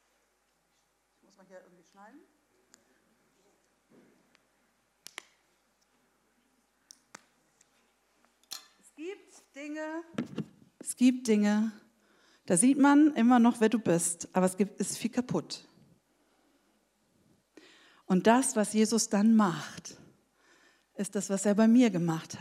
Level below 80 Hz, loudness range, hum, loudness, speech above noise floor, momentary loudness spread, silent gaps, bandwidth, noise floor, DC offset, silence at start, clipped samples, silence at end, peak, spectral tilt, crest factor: -80 dBFS; 17 LU; none; -27 LUFS; 47 dB; 22 LU; none; 14.5 kHz; -74 dBFS; under 0.1%; 1.55 s; under 0.1%; 0 s; -10 dBFS; -5 dB/octave; 22 dB